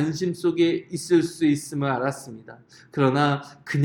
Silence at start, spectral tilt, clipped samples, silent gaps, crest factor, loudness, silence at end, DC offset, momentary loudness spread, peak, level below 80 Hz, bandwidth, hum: 0 s; -6 dB/octave; under 0.1%; none; 16 dB; -23 LUFS; 0 s; under 0.1%; 13 LU; -8 dBFS; -64 dBFS; 17 kHz; none